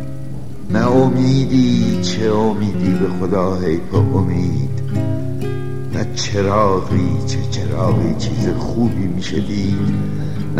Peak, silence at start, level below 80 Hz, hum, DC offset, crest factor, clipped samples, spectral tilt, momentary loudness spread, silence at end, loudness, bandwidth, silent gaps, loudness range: -2 dBFS; 0 s; -36 dBFS; none; 6%; 16 dB; under 0.1%; -7 dB/octave; 9 LU; 0 s; -18 LUFS; 12.5 kHz; none; 3 LU